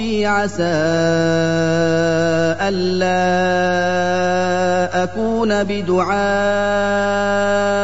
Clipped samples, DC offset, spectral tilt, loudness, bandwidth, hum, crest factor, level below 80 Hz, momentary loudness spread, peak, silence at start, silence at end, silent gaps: under 0.1%; 2%; -5.5 dB/octave; -17 LUFS; 8 kHz; none; 12 dB; -44 dBFS; 2 LU; -4 dBFS; 0 s; 0 s; none